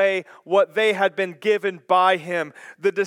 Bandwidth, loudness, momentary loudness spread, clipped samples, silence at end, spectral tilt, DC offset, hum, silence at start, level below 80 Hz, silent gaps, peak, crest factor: 14 kHz; -21 LUFS; 9 LU; under 0.1%; 0 s; -4.5 dB/octave; under 0.1%; none; 0 s; -88 dBFS; none; -4 dBFS; 16 dB